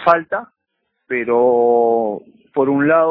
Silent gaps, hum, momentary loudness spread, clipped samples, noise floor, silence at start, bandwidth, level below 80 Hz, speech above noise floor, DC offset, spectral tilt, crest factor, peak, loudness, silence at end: none; none; 12 LU; under 0.1%; -73 dBFS; 0 s; 5.4 kHz; -62 dBFS; 58 dB; under 0.1%; -9 dB/octave; 16 dB; 0 dBFS; -16 LUFS; 0 s